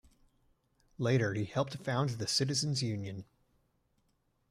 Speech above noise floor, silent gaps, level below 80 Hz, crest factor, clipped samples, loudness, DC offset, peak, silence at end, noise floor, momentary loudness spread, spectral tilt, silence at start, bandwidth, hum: 43 dB; none; -68 dBFS; 18 dB; under 0.1%; -33 LUFS; under 0.1%; -18 dBFS; 1.3 s; -76 dBFS; 9 LU; -4.5 dB/octave; 1 s; 14.5 kHz; none